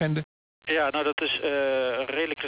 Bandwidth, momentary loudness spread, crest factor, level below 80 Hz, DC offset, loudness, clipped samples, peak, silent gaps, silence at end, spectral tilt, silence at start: 4 kHz; 7 LU; 14 dB; -64 dBFS; under 0.1%; -26 LUFS; under 0.1%; -14 dBFS; 0.24-0.62 s, 1.13-1.17 s; 0 s; -9 dB/octave; 0 s